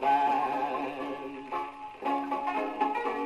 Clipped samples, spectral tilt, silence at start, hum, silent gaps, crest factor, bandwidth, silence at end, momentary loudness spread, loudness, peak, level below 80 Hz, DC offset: under 0.1%; -5 dB/octave; 0 s; none; none; 16 dB; 12.5 kHz; 0 s; 10 LU; -31 LUFS; -16 dBFS; -68 dBFS; under 0.1%